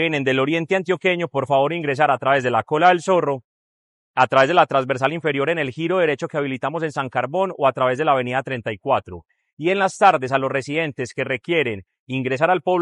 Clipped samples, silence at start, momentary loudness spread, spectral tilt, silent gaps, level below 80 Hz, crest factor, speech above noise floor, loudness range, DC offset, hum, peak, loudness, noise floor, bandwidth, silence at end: under 0.1%; 0 s; 10 LU; -5.5 dB/octave; 3.44-4.14 s, 9.53-9.57 s, 11.99-12.07 s; -64 dBFS; 18 dB; over 70 dB; 3 LU; under 0.1%; none; -2 dBFS; -20 LUFS; under -90 dBFS; 11.5 kHz; 0 s